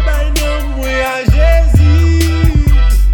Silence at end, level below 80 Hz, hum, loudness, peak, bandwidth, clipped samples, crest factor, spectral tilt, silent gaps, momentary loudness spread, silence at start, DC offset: 0 s; -10 dBFS; none; -12 LUFS; 0 dBFS; 18.5 kHz; under 0.1%; 10 dB; -6 dB/octave; none; 6 LU; 0 s; under 0.1%